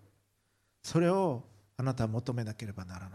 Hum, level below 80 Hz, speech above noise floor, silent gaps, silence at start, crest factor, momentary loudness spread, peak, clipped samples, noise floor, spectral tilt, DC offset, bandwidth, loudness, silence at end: none; -62 dBFS; 43 dB; none; 0.85 s; 16 dB; 15 LU; -18 dBFS; under 0.1%; -75 dBFS; -7 dB/octave; under 0.1%; 13.5 kHz; -33 LUFS; 0 s